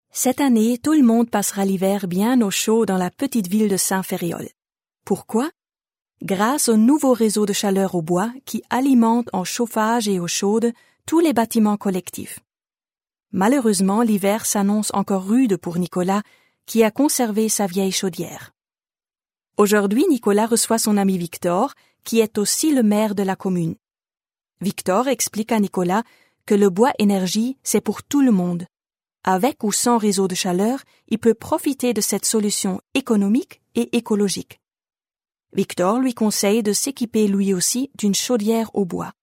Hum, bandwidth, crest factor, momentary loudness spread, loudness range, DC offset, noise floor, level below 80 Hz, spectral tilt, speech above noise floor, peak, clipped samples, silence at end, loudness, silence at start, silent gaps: none; 16 kHz; 16 dB; 9 LU; 3 LU; under 0.1%; under -90 dBFS; -66 dBFS; -4.5 dB/octave; over 71 dB; -2 dBFS; under 0.1%; 0.1 s; -19 LUFS; 0.15 s; none